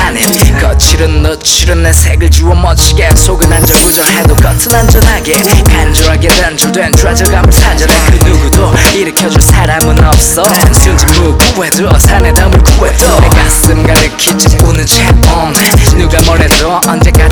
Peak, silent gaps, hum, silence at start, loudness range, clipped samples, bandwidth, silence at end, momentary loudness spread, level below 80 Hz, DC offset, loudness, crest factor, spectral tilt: 0 dBFS; none; none; 0 s; 1 LU; 6%; over 20 kHz; 0 s; 2 LU; -8 dBFS; under 0.1%; -6 LUFS; 6 dB; -4 dB/octave